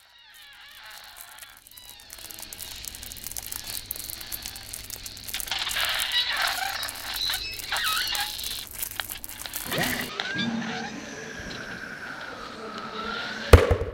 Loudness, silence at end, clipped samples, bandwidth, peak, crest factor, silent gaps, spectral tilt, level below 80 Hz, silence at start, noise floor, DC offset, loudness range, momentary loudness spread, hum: -28 LUFS; 0 s; under 0.1%; 17 kHz; 0 dBFS; 30 dB; none; -3.5 dB/octave; -38 dBFS; 0.15 s; -51 dBFS; under 0.1%; 10 LU; 19 LU; none